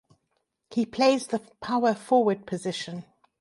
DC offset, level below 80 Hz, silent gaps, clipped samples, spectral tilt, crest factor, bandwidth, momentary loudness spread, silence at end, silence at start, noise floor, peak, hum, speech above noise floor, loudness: under 0.1%; -70 dBFS; none; under 0.1%; -5 dB/octave; 18 dB; 11.5 kHz; 11 LU; 0.4 s; 0.7 s; -77 dBFS; -8 dBFS; none; 51 dB; -26 LUFS